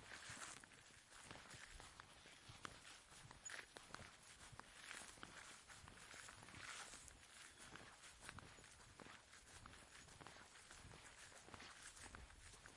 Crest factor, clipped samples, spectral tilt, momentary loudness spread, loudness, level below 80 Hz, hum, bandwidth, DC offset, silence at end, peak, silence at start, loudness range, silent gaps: 30 dB; under 0.1%; -2 dB/octave; 7 LU; -59 LUFS; -74 dBFS; none; 12 kHz; under 0.1%; 0 s; -32 dBFS; 0 s; 3 LU; none